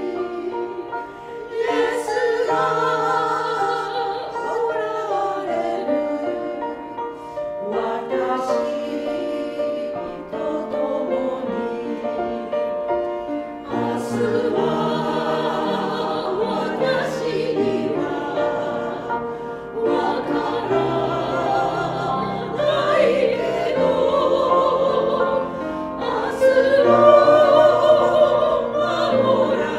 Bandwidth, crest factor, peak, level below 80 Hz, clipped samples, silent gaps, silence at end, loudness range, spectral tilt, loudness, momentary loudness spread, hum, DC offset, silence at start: 12.5 kHz; 20 dB; 0 dBFS; -54 dBFS; under 0.1%; none; 0 s; 9 LU; -6 dB/octave; -21 LUFS; 12 LU; none; under 0.1%; 0 s